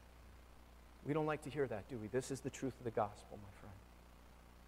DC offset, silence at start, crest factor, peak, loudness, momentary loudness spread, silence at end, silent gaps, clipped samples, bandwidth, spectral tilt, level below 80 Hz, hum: under 0.1%; 0 s; 22 dB; -24 dBFS; -43 LUFS; 22 LU; 0 s; none; under 0.1%; 16 kHz; -6 dB/octave; -64 dBFS; 60 Hz at -65 dBFS